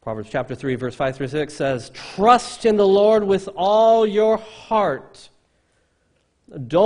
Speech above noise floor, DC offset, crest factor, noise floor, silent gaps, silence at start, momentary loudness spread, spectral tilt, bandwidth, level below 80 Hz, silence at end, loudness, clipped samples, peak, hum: 46 dB; under 0.1%; 20 dB; -65 dBFS; none; 0.05 s; 12 LU; -5.5 dB/octave; 10.5 kHz; -54 dBFS; 0 s; -19 LUFS; under 0.1%; 0 dBFS; none